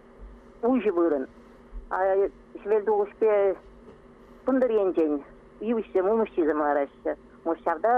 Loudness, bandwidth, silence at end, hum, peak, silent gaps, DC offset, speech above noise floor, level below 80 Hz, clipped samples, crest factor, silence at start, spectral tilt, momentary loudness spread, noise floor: -26 LUFS; 4.1 kHz; 0 s; none; -12 dBFS; none; under 0.1%; 26 dB; -52 dBFS; under 0.1%; 14 dB; 0.2 s; -8 dB/octave; 10 LU; -51 dBFS